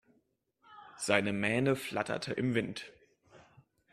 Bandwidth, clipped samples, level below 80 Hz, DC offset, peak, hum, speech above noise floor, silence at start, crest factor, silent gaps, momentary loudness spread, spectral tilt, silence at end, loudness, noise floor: 13.5 kHz; under 0.1%; -68 dBFS; under 0.1%; -10 dBFS; none; 43 dB; 0.7 s; 26 dB; none; 14 LU; -5 dB/octave; 0.55 s; -32 LUFS; -75 dBFS